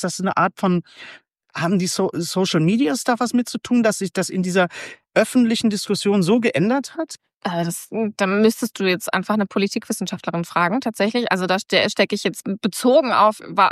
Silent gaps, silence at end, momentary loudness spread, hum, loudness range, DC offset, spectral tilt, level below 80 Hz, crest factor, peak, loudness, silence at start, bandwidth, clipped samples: 7.36-7.41 s; 0 s; 8 LU; none; 2 LU; under 0.1%; -5 dB/octave; -68 dBFS; 18 dB; -2 dBFS; -20 LUFS; 0 s; 14 kHz; under 0.1%